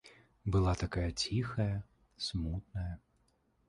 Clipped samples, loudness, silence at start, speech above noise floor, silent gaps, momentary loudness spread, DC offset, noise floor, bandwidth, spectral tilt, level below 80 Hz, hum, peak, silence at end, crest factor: under 0.1%; -36 LUFS; 0.05 s; 39 dB; none; 11 LU; under 0.1%; -74 dBFS; 11 kHz; -5.5 dB/octave; -46 dBFS; none; -18 dBFS; 0.7 s; 18 dB